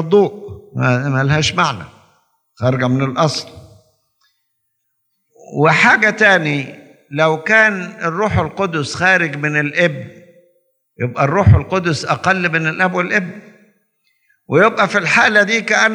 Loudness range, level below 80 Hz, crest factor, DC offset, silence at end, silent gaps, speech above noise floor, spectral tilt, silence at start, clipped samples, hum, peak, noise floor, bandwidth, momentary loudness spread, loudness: 6 LU; -44 dBFS; 16 dB; under 0.1%; 0 s; none; 54 dB; -5 dB/octave; 0 s; under 0.1%; none; 0 dBFS; -69 dBFS; 10.5 kHz; 12 LU; -14 LUFS